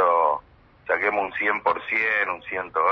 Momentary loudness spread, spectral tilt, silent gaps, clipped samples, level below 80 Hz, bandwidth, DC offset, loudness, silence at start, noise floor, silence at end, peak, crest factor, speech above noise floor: 8 LU; -5.5 dB/octave; none; under 0.1%; -60 dBFS; 6.4 kHz; under 0.1%; -23 LUFS; 0 s; -51 dBFS; 0 s; -6 dBFS; 18 dB; 27 dB